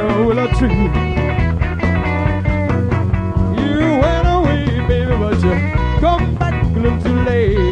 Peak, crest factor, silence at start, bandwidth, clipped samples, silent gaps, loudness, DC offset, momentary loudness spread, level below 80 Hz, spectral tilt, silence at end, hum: -2 dBFS; 14 dB; 0 s; 8.8 kHz; under 0.1%; none; -16 LUFS; under 0.1%; 3 LU; -22 dBFS; -8.5 dB/octave; 0 s; none